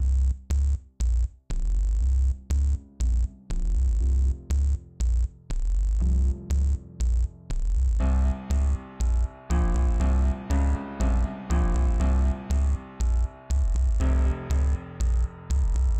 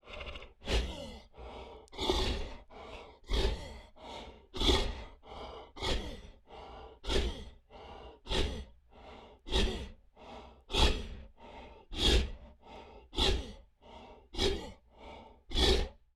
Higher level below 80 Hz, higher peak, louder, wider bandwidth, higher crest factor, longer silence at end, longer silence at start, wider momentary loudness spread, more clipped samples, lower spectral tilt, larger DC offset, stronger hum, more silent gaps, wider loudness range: first, -24 dBFS vs -38 dBFS; second, -14 dBFS vs -10 dBFS; first, -27 LUFS vs -34 LUFS; second, 8.6 kHz vs 14 kHz; second, 10 dB vs 24 dB; second, 0 s vs 0.2 s; about the same, 0 s vs 0.05 s; second, 5 LU vs 23 LU; neither; first, -7 dB/octave vs -4 dB/octave; neither; neither; neither; second, 2 LU vs 5 LU